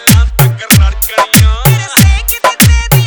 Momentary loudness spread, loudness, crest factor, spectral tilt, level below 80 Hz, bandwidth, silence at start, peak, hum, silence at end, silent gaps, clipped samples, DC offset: 4 LU; -8 LUFS; 8 dB; -4 dB/octave; -14 dBFS; over 20 kHz; 0 s; 0 dBFS; none; 0 s; none; 2%; under 0.1%